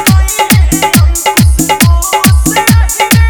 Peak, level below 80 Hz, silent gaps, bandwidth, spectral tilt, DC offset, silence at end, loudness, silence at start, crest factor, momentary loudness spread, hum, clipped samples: 0 dBFS; -12 dBFS; none; over 20 kHz; -4 dB/octave; under 0.1%; 0 s; -8 LUFS; 0 s; 6 dB; 1 LU; none; 1%